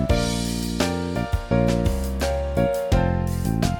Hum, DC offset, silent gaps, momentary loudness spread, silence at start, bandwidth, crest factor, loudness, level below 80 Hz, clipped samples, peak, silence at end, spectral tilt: none; under 0.1%; none; 4 LU; 0 s; 18 kHz; 16 dB; -23 LUFS; -30 dBFS; under 0.1%; -6 dBFS; 0 s; -6 dB/octave